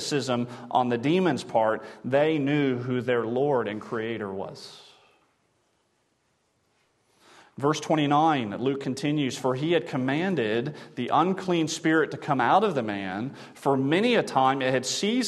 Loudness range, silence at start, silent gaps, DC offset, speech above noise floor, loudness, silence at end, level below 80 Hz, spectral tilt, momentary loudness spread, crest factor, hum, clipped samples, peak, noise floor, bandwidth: 9 LU; 0 s; none; under 0.1%; 46 dB; -26 LUFS; 0 s; -72 dBFS; -5 dB/octave; 10 LU; 18 dB; none; under 0.1%; -8 dBFS; -71 dBFS; 12.5 kHz